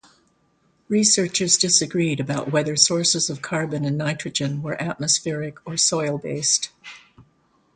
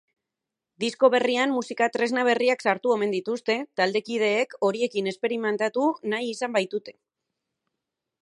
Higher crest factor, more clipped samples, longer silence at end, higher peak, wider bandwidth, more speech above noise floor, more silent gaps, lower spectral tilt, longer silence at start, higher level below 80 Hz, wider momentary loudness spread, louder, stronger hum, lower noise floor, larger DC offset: about the same, 22 dB vs 20 dB; neither; second, 0.55 s vs 1.3 s; first, 0 dBFS vs -6 dBFS; second, 9.6 kHz vs 11 kHz; second, 42 dB vs 62 dB; neither; about the same, -3 dB/octave vs -4 dB/octave; about the same, 0.9 s vs 0.8 s; first, -62 dBFS vs -80 dBFS; first, 11 LU vs 6 LU; first, -20 LUFS vs -25 LUFS; neither; second, -64 dBFS vs -87 dBFS; neither